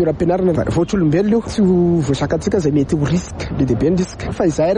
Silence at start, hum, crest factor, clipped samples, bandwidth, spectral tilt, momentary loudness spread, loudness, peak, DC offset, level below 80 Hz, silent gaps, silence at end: 0 s; none; 12 dB; under 0.1%; 10.5 kHz; -7.5 dB/octave; 5 LU; -17 LUFS; -4 dBFS; under 0.1%; -34 dBFS; none; 0 s